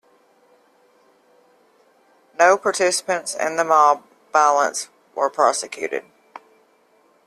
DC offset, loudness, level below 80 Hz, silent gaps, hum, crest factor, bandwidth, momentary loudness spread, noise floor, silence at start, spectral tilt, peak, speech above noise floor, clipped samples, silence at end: under 0.1%; -19 LUFS; -72 dBFS; none; none; 20 dB; 13.5 kHz; 13 LU; -59 dBFS; 2.4 s; -1.5 dB/octave; -2 dBFS; 40 dB; under 0.1%; 1.25 s